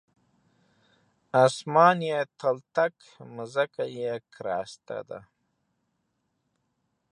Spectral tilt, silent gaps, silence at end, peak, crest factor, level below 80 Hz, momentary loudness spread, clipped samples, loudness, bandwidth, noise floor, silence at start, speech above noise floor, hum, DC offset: -5 dB/octave; none; 1.9 s; -6 dBFS; 24 dB; -76 dBFS; 18 LU; under 0.1%; -26 LUFS; 11 kHz; -77 dBFS; 1.35 s; 50 dB; none; under 0.1%